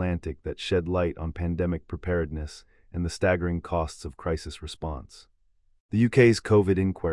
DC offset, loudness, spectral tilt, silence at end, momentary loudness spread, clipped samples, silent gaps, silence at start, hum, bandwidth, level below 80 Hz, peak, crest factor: under 0.1%; -26 LUFS; -7 dB/octave; 0 s; 16 LU; under 0.1%; 5.80-5.89 s; 0 s; none; 12 kHz; -44 dBFS; -6 dBFS; 20 dB